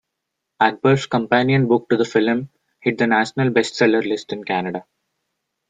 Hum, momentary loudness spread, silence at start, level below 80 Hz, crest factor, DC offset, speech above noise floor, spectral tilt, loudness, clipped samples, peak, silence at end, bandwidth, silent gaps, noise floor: none; 8 LU; 0.6 s; -60 dBFS; 18 dB; under 0.1%; 61 dB; -6 dB/octave; -19 LUFS; under 0.1%; -2 dBFS; 0.85 s; 9.4 kHz; none; -79 dBFS